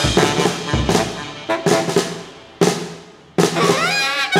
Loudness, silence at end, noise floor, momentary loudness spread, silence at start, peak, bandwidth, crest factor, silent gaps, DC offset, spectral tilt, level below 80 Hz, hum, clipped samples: -18 LUFS; 0 s; -38 dBFS; 13 LU; 0 s; 0 dBFS; 16.5 kHz; 18 dB; none; under 0.1%; -4 dB/octave; -36 dBFS; none; under 0.1%